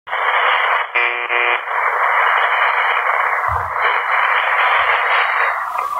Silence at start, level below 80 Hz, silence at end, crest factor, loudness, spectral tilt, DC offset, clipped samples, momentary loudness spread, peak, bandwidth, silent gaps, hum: 0.05 s; -50 dBFS; 0 s; 14 dB; -15 LUFS; -2.5 dB/octave; under 0.1%; under 0.1%; 4 LU; -2 dBFS; 16 kHz; none; none